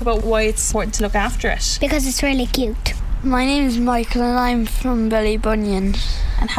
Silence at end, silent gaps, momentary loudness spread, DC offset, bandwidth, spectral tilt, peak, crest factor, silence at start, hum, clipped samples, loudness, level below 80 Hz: 0 s; none; 5 LU; under 0.1%; 16 kHz; -4 dB/octave; -2 dBFS; 16 dB; 0 s; none; under 0.1%; -19 LUFS; -22 dBFS